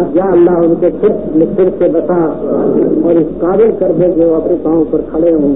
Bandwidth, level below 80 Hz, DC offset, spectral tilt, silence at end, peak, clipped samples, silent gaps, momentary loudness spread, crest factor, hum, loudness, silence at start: 3.7 kHz; -38 dBFS; 2%; -14.5 dB/octave; 0 s; 0 dBFS; under 0.1%; none; 4 LU; 10 dB; none; -11 LUFS; 0 s